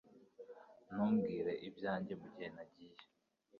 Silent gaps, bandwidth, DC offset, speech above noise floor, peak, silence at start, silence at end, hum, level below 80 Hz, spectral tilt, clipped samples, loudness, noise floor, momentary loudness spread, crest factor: none; 5 kHz; under 0.1%; 32 dB; -26 dBFS; 0.15 s; 0 s; none; -78 dBFS; -6.5 dB/octave; under 0.1%; -41 LUFS; -73 dBFS; 24 LU; 18 dB